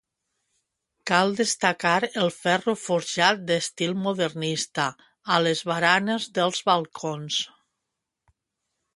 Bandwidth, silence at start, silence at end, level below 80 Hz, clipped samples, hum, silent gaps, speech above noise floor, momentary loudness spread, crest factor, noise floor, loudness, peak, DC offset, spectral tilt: 11.5 kHz; 1.05 s; 1.5 s; -72 dBFS; under 0.1%; none; none; 59 dB; 7 LU; 24 dB; -83 dBFS; -24 LUFS; -2 dBFS; under 0.1%; -3.5 dB/octave